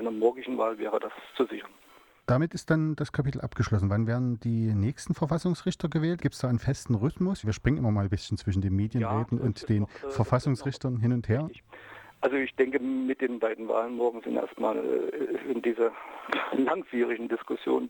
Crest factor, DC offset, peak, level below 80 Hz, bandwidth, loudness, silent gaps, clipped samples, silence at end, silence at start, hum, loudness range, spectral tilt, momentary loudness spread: 16 dB; under 0.1%; -12 dBFS; -52 dBFS; 19 kHz; -29 LUFS; none; under 0.1%; 0 s; 0 s; none; 1 LU; -7.5 dB/octave; 5 LU